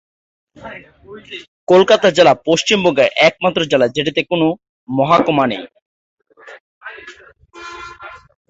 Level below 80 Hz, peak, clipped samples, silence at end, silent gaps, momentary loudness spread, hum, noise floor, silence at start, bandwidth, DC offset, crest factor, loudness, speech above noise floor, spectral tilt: -54 dBFS; 0 dBFS; under 0.1%; 0.35 s; 1.48-1.67 s, 4.69-4.87 s, 5.82-6.17 s, 6.60-6.81 s; 23 LU; none; -42 dBFS; 0.6 s; 8 kHz; under 0.1%; 16 dB; -14 LUFS; 28 dB; -4.5 dB/octave